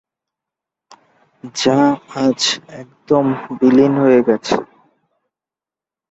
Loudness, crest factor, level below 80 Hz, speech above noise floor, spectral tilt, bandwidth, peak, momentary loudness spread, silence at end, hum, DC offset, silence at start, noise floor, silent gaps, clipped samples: -15 LUFS; 16 dB; -58 dBFS; 74 dB; -5 dB/octave; 8.2 kHz; -2 dBFS; 12 LU; 1.45 s; none; under 0.1%; 1.45 s; -89 dBFS; none; under 0.1%